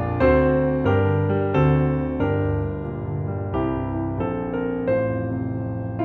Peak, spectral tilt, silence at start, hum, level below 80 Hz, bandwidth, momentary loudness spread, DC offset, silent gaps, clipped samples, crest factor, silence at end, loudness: -4 dBFS; -10.5 dB/octave; 0 s; none; -36 dBFS; 4.6 kHz; 9 LU; under 0.1%; none; under 0.1%; 16 dB; 0 s; -22 LUFS